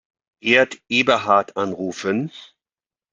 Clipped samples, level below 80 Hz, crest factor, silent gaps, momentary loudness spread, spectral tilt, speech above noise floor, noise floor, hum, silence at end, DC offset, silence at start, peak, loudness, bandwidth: under 0.1%; -66 dBFS; 20 dB; none; 9 LU; -4.5 dB/octave; over 70 dB; under -90 dBFS; none; 0.7 s; under 0.1%; 0.45 s; -2 dBFS; -19 LUFS; 9.2 kHz